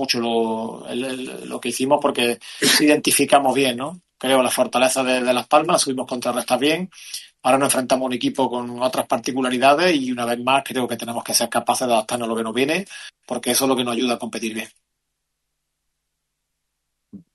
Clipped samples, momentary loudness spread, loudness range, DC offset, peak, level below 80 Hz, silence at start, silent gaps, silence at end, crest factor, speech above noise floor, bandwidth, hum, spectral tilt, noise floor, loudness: under 0.1%; 12 LU; 7 LU; under 0.1%; -2 dBFS; -66 dBFS; 0 s; none; 0.15 s; 20 dB; 57 dB; 12.5 kHz; none; -3 dB/octave; -77 dBFS; -20 LUFS